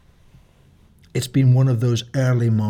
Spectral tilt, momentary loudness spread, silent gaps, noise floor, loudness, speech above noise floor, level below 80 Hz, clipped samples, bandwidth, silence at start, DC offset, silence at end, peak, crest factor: -7 dB/octave; 9 LU; none; -52 dBFS; -19 LUFS; 35 dB; -54 dBFS; under 0.1%; 14 kHz; 1.15 s; under 0.1%; 0 s; -6 dBFS; 12 dB